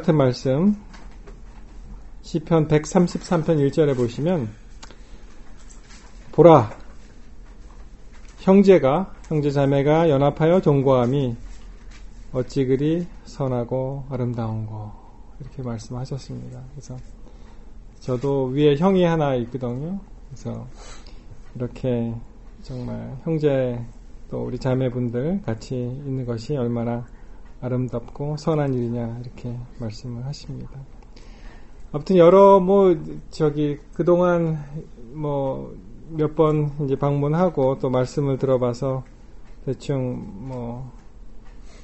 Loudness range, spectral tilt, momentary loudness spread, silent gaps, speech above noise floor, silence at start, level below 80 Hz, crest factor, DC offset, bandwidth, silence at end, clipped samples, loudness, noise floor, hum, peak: 11 LU; -8 dB/octave; 19 LU; none; 21 dB; 0 s; -42 dBFS; 22 dB; under 0.1%; 8.2 kHz; 0 s; under 0.1%; -21 LUFS; -41 dBFS; none; 0 dBFS